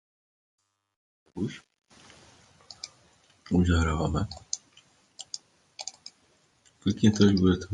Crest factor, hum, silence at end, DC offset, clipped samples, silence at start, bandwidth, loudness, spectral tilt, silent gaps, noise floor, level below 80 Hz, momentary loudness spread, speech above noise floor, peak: 24 dB; none; 0 s; under 0.1%; under 0.1%; 1.35 s; 9.6 kHz; -27 LUFS; -6 dB/octave; none; -66 dBFS; -40 dBFS; 25 LU; 41 dB; -6 dBFS